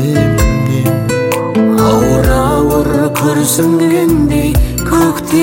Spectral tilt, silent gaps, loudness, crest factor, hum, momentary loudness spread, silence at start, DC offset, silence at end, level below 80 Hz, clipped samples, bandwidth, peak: -6 dB/octave; none; -11 LUFS; 10 dB; none; 3 LU; 0 s; under 0.1%; 0 s; -20 dBFS; under 0.1%; 16.5 kHz; 0 dBFS